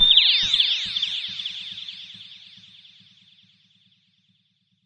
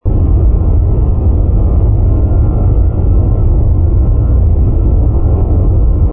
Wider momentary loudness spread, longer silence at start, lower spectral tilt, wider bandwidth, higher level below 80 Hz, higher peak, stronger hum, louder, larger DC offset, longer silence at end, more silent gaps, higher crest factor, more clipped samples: first, 26 LU vs 1 LU; about the same, 0 s vs 0.05 s; second, 0.5 dB/octave vs -16 dB/octave; first, 10.5 kHz vs 1.5 kHz; second, -54 dBFS vs -10 dBFS; about the same, -2 dBFS vs -2 dBFS; neither; second, -19 LUFS vs -12 LUFS; neither; first, 2.5 s vs 0 s; neither; first, 22 dB vs 6 dB; neither